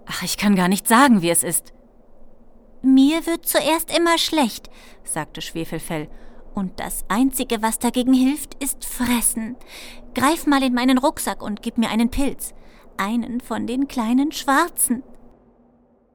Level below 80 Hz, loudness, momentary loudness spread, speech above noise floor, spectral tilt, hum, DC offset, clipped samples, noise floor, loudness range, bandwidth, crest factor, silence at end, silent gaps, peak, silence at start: -40 dBFS; -20 LUFS; 13 LU; 37 dB; -3.5 dB/octave; none; under 0.1%; under 0.1%; -57 dBFS; 5 LU; over 20 kHz; 20 dB; 1 s; none; -2 dBFS; 0.05 s